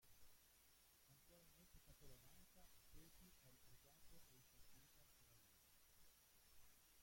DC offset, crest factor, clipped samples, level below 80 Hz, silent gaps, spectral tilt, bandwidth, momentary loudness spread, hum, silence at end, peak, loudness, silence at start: under 0.1%; 16 dB; under 0.1%; -76 dBFS; none; -2.5 dB/octave; 16.5 kHz; 2 LU; none; 0 s; -52 dBFS; -69 LUFS; 0 s